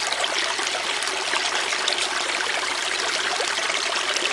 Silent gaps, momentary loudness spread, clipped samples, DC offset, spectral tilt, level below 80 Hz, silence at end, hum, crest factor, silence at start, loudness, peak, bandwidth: none; 2 LU; under 0.1%; under 0.1%; 1 dB/octave; -68 dBFS; 0 s; none; 22 dB; 0 s; -22 LUFS; -2 dBFS; 11.5 kHz